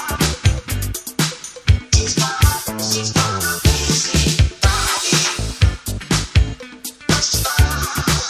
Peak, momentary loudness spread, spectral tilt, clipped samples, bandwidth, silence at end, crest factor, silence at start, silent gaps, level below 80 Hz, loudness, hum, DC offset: 0 dBFS; 8 LU; -3.5 dB/octave; under 0.1%; 16 kHz; 0 s; 16 dB; 0 s; none; -22 dBFS; -17 LUFS; none; under 0.1%